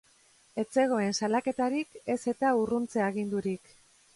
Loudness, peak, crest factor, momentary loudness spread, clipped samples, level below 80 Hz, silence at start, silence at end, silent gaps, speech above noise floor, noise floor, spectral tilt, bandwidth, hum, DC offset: -30 LUFS; -14 dBFS; 16 dB; 9 LU; under 0.1%; -68 dBFS; 0.55 s; 0.6 s; none; 34 dB; -63 dBFS; -5 dB/octave; 11.5 kHz; none; under 0.1%